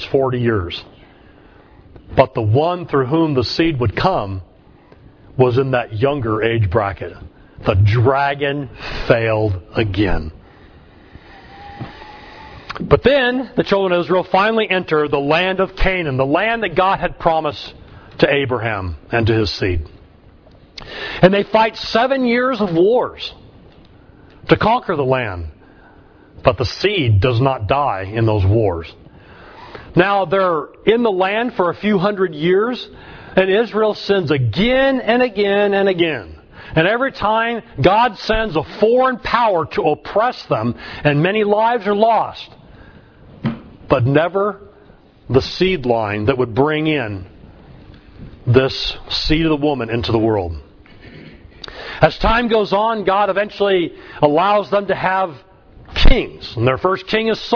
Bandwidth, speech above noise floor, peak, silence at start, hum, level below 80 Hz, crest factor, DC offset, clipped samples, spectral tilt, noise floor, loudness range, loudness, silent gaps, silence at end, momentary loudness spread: 5.4 kHz; 30 dB; 0 dBFS; 0 s; none; -30 dBFS; 18 dB; under 0.1%; under 0.1%; -7.5 dB/octave; -46 dBFS; 4 LU; -17 LUFS; none; 0 s; 13 LU